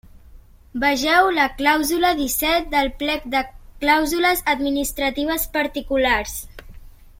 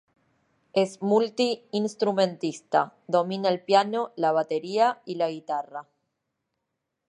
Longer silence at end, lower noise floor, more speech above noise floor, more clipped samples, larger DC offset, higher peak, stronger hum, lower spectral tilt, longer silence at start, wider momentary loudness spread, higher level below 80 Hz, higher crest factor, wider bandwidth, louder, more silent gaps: second, 0.3 s vs 1.3 s; second, -45 dBFS vs -82 dBFS; second, 25 dB vs 56 dB; neither; neither; first, -2 dBFS vs -8 dBFS; neither; second, -2.5 dB/octave vs -5 dB/octave; second, 0.35 s vs 0.75 s; about the same, 8 LU vs 9 LU; first, -40 dBFS vs -80 dBFS; about the same, 18 dB vs 20 dB; first, 16.5 kHz vs 11.5 kHz; first, -19 LUFS vs -26 LUFS; neither